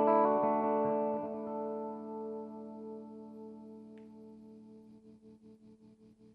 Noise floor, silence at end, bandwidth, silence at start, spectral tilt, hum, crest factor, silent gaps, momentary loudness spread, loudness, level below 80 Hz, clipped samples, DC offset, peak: -60 dBFS; 0.25 s; 5.2 kHz; 0 s; -9.5 dB/octave; 60 Hz at -70 dBFS; 22 dB; none; 24 LU; -34 LUFS; -80 dBFS; under 0.1%; under 0.1%; -16 dBFS